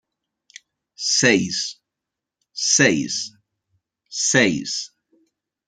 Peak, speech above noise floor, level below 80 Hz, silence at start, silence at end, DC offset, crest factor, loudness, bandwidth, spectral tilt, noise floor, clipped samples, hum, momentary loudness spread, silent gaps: -2 dBFS; 65 dB; -64 dBFS; 1 s; 0.8 s; under 0.1%; 22 dB; -19 LUFS; 10.5 kHz; -2.5 dB/octave; -85 dBFS; under 0.1%; none; 16 LU; none